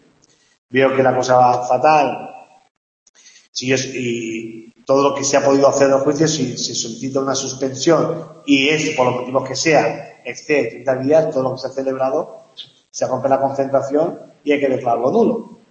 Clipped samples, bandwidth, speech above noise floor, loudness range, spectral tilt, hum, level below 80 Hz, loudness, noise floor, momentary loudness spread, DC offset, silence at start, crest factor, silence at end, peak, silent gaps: under 0.1%; 8.4 kHz; 39 dB; 4 LU; -4 dB/octave; none; -62 dBFS; -17 LUFS; -56 dBFS; 14 LU; under 0.1%; 0.7 s; 16 dB; 0.15 s; -2 dBFS; 2.71-3.14 s, 3.48-3.53 s